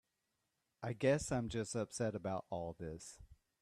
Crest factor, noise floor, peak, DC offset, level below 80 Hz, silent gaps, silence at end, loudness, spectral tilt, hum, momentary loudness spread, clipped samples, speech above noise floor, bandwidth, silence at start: 20 dB; -86 dBFS; -22 dBFS; under 0.1%; -64 dBFS; none; 0.3 s; -40 LUFS; -5.5 dB/octave; none; 15 LU; under 0.1%; 46 dB; 13.5 kHz; 0.8 s